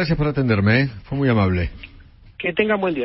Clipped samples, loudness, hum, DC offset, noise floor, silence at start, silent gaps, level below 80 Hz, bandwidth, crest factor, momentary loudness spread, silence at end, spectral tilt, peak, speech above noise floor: under 0.1%; -20 LUFS; none; under 0.1%; -40 dBFS; 0 s; none; -38 dBFS; 5.8 kHz; 16 dB; 8 LU; 0 s; -11.5 dB/octave; -4 dBFS; 20 dB